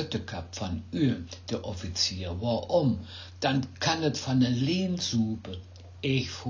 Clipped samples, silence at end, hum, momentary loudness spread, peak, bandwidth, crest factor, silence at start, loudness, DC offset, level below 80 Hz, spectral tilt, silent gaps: under 0.1%; 0 s; none; 10 LU; -12 dBFS; 7.6 kHz; 18 dB; 0 s; -29 LUFS; under 0.1%; -48 dBFS; -5 dB/octave; none